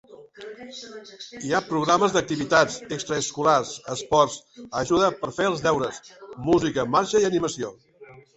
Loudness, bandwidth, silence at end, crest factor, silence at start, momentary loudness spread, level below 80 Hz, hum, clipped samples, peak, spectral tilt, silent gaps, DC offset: -23 LUFS; 8.2 kHz; 0.15 s; 22 dB; 0.1 s; 19 LU; -56 dBFS; none; under 0.1%; -2 dBFS; -4 dB/octave; none; under 0.1%